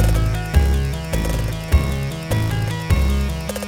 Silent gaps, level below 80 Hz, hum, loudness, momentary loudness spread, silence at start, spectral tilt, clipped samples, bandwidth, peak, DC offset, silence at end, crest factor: none; -22 dBFS; none; -21 LUFS; 5 LU; 0 s; -6 dB/octave; under 0.1%; 17.5 kHz; -2 dBFS; under 0.1%; 0 s; 16 dB